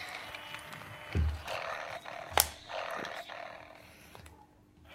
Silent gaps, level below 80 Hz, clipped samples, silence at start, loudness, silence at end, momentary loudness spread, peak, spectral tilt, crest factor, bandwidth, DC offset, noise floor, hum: none; -46 dBFS; under 0.1%; 0 s; -36 LUFS; 0 s; 24 LU; -4 dBFS; -2.5 dB/octave; 34 dB; 16 kHz; under 0.1%; -60 dBFS; none